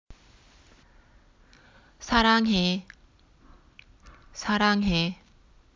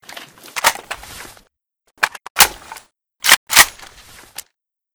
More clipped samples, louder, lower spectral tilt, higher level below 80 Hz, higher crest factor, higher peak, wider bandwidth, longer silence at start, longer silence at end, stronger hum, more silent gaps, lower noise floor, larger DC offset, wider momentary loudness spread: second, under 0.1% vs 0.2%; second, -24 LUFS vs -13 LUFS; first, -5 dB/octave vs 1.5 dB/octave; about the same, -46 dBFS vs -50 dBFS; about the same, 24 dB vs 20 dB; second, -6 dBFS vs 0 dBFS; second, 7.6 kHz vs over 20 kHz; about the same, 0.1 s vs 0.15 s; second, 0.6 s vs 1.25 s; neither; second, none vs 2.30-2.35 s, 3.37-3.47 s; second, -58 dBFS vs -68 dBFS; neither; second, 21 LU vs 25 LU